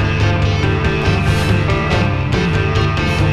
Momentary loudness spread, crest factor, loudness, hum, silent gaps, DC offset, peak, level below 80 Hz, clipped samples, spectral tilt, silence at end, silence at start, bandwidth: 1 LU; 12 dB; -15 LUFS; none; none; under 0.1%; -2 dBFS; -24 dBFS; under 0.1%; -6.5 dB/octave; 0 s; 0 s; 12 kHz